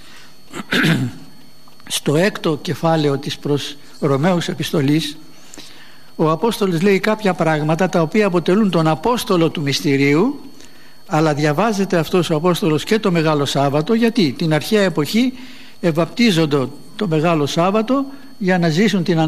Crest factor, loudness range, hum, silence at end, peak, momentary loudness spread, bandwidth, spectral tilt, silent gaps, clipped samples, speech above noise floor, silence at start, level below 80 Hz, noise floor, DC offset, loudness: 16 dB; 3 LU; none; 0 s; -2 dBFS; 7 LU; 15 kHz; -5.5 dB/octave; none; under 0.1%; 30 dB; 0.5 s; -54 dBFS; -46 dBFS; 2%; -17 LUFS